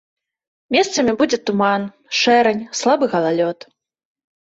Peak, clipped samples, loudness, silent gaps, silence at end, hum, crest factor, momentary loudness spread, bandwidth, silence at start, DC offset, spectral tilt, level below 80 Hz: -2 dBFS; under 0.1%; -17 LUFS; none; 1 s; none; 16 dB; 8 LU; 8 kHz; 0.7 s; under 0.1%; -3.5 dB/octave; -60 dBFS